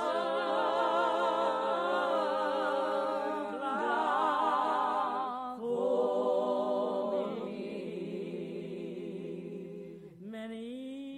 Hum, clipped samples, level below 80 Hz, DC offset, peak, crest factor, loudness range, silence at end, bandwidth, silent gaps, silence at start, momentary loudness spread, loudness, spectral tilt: none; under 0.1%; -74 dBFS; under 0.1%; -18 dBFS; 14 dB; 10 LU; 0 s; 11 kHz; none; 0 s; 13 LU; -32 LUFS; -5.5 dB/octave